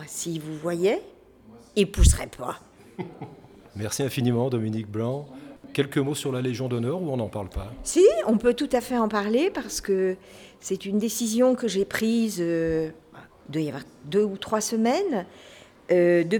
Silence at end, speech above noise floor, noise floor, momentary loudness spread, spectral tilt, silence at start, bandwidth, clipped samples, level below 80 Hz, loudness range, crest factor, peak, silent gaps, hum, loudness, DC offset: 0 s; 26 dB; -51 dBFS; 17 LU; -5.5 dB/octave; 0 s; over 20 kHz; under 0.1%; -36 dBFS; 5 LU; 20 dB; -6 dBFS; none; none; -25 LUFS; under 0.1%